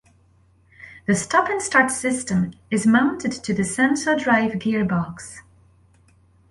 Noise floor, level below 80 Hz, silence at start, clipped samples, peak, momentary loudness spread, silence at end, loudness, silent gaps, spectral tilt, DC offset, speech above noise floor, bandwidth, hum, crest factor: -57 dBFS; -54 dBFS; 0.8 s; under 0.1%; -2 dBFS; 9 LU; 1.1 s; -21 LUFS; none; -4.5 dB/octave; under 0.1%; 37 dB; 11.5 kHz; none; 20 dB